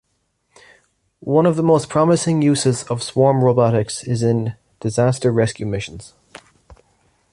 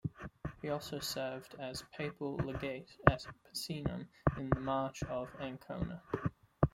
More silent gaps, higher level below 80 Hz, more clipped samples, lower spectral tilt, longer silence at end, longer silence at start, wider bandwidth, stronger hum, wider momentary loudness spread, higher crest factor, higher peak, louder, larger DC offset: neither; about the same, -50 dBFS vs -52 dBFS; neither; about the same, -6 dB/octave vs -6 dB/octave; first, 0.6 s vs 0.05 s; first, 1.25 s vs 0.05 s; second, 11.5 kHz vs 16.5 kHz; neither; about the same, 12 LU vs 12 LU; second, 16 dB vs 34 dB; about the same, -2 dBFS vs -4 dBFS; first, -18 LUFS vs -39 LUFS; neither